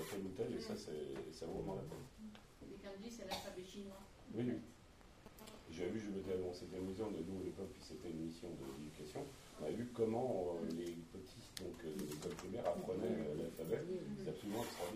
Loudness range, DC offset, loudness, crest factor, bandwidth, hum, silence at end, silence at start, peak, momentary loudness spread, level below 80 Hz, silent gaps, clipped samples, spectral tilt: 5 LU; under 0.1%; -46 LUFS; 22 dB; 15.5 kHz; none; 0 s; 0 s; -24 dBFS; 13 LU; -66 dBFS; none; under 0.1%; -5.5 dB/octave